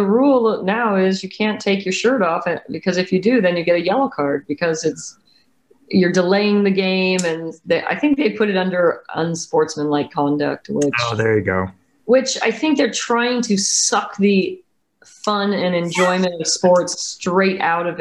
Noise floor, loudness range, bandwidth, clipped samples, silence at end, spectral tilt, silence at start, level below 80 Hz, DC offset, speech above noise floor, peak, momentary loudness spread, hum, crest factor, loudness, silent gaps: -57 dBFS; 2 LU; 12 kHz; under 0.1%; 0 s; -4.5 dB/octave; 0 s; -60 dBFS; under 0.1%; 39 dB; -4 dBFS; 7 LU; none; 14 dB; -18 LUFS; none